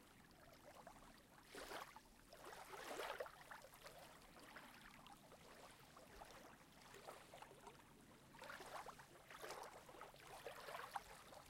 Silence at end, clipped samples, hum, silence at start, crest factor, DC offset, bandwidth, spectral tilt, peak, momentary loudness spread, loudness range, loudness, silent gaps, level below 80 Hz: 0 s; under 0.1%; none; 0 s; 26 dB; under 0.1%; 16.5 kHz; -2.5 dB/octave; -34 dBFS; 12 LU; 6 LU; -58 LUFS; none; -76 dBFS